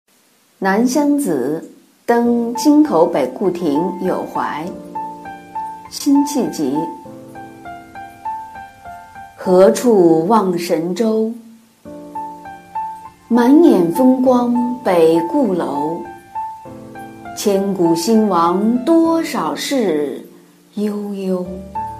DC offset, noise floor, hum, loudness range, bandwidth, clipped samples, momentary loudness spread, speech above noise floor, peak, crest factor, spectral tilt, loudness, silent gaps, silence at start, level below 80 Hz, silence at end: under 0.1%; -55 dBFS; none; 7 LU; 15.5 kHz; under 0.1%; 22 LU; 41 dB; 0 dBFS; 16 dB; -6 dB/octave; -16 LUFS; none; 0.6 s; -54 dBFS; 0 s